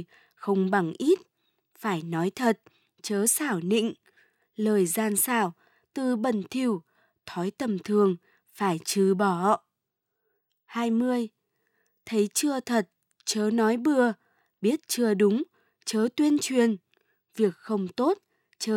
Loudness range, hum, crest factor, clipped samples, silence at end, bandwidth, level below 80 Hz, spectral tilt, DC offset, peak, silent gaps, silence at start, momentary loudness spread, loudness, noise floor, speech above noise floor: 3 LU; none; 18 dB; under 0.1%; 0 s; 18 kHz; -80 dBFS; -4.5 dB/octave; under 0.1%; -10 dBFS; none; 0 s; 11 LU; -27 LUFS; -83 dBFS; 58 dB